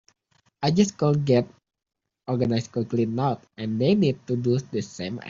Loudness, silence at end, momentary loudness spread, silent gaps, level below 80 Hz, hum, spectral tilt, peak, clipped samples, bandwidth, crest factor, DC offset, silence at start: -24 LUFS; 0 s; 11 LU; none; -60 dBFS; none; -7 dB/octave; -6 dBFS; under 0.1%; 7.6 kHz; 18 dB; under 0.1%; 0.6 s